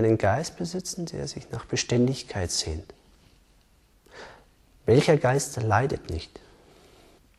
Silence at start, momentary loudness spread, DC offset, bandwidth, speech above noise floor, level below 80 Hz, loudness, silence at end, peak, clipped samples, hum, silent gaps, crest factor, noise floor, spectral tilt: 0 s; 18 LU; under 0.1%; 13.5 kHz; 35 dB; -48 dBFS; -26 LUFS; 1.15 s; -8 dBFS; under 0.1%; none; none; 20 dB; -60 dBFS; -5 dB/octave